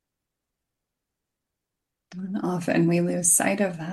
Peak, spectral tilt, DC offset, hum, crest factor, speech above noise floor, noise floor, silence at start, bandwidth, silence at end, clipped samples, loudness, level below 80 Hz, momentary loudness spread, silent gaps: -6 dBFS; -4.5 dB/octave; under 0.1%; none; 22 dB; 61 dB; -84 dBFS; 2.1 s; 12.5 kHz; 0 s; under 0.1%; -22 LUFS; -72 dBFS; 12 LU; none